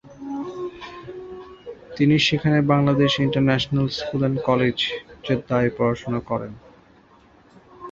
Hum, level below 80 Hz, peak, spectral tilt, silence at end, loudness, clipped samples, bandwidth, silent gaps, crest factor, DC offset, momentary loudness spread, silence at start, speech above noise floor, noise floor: none; -52 dBFS; -4 dBFS; -6.5 dB/octave; 0 s; -21 LUFS; under 0.1%; 7.6 kHz; none; 18 dB; under 0.1%; 20 LU; 0.05 s; 33 dB; -53 dBFS